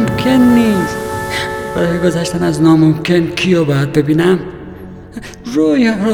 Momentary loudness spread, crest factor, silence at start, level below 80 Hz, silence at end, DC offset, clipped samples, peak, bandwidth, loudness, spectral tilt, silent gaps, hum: 19 LU; 12 dB; 0 s; -38 dBFS; 0 s; under 0.1%; under 0.1%; 0 dBFS; 18.5 kHz; -13 LUFS; -6.5 dB/octave; none; none